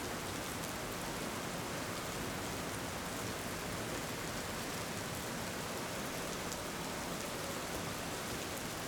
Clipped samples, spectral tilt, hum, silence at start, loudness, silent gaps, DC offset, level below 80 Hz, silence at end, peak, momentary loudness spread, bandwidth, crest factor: under 0.1%; -3.5 dB/octave; none; 0 s; -40 LUFS; none; under 0.1%; -58 dBFS; 0 s; -20 dBFS; 1 LU; over 20 kHz; 20 dB